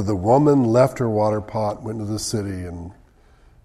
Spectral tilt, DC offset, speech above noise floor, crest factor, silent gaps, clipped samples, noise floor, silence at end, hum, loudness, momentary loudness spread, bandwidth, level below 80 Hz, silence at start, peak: -7 dB/octave; under 0.1%; 32 dB; 18 dB; none; under 0.1%; -52 dBFS; 0.7 s; none; -20 LUFS; 16 LU; 14 kHz; -48 dBFS; 0 s; -2 dBFS